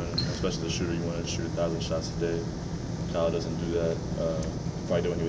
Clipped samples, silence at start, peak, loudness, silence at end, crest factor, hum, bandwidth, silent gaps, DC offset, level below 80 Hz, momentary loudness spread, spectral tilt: under 0.1%; 0 s; -14 dBFS; -30 LUFS; 0 s; 14 dB; none; 8 kHz; none; under 0.1%; -42 dBFS; 5 LU; -5.5 dB/octave